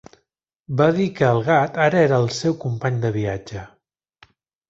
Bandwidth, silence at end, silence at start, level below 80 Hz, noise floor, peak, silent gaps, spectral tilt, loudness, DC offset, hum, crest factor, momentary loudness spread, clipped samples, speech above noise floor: 8 kHz; 1.05 s; 0.7 s; -52 dBFS; -73 dBFS; -2 dBFS; none; -6.5 dB/octave; -20 LUFS; under 0.1%; none; 18 dB; 11 LU; under 0.1%; 54 dB